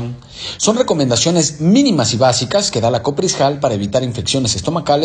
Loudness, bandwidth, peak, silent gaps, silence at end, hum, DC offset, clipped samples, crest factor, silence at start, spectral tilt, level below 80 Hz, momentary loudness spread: -15 LUFS; 11 kHz; -2 dBFS; none; 0 s; none; under 0.1%; under 0.1%; 14 dB; 0 s; -4.5 dB/octave; -46 dBFS; 5 LU